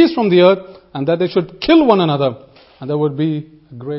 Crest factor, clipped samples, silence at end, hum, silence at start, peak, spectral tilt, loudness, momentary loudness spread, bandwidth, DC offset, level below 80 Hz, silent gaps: 14 dB; under 0.1%; 0 s; none; 0 s; 0 dBFS; -10 dB/octave; -15 LUFS; 14 LU; 5.8 kHz; under 0.1%; -50 dBFS; none